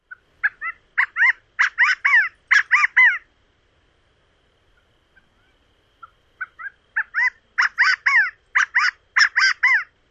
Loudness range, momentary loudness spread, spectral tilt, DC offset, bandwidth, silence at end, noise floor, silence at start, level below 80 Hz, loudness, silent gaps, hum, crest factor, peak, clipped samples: 11 LU; 13 LU; 3.5 dB/octave; under 0.1%; 8 kHz; 0.25 s; -62 dBFS; 0.1 s; -66 dBFS; -17 LUFS; none; none; 18 dB; -4 dBFS; under 0.1%